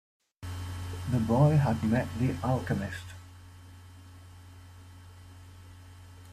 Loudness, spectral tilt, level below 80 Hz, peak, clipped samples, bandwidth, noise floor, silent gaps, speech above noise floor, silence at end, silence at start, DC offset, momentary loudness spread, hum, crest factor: -29 LUFS; -7.5 dB/octave; -56 dBFS; -12 dBFS; under 0.1%; 14.5 kHz; -50 dBFS; none; 23 dB; 0 s; 0.4 s; under 0.1%; 27 LU; none; 20 dB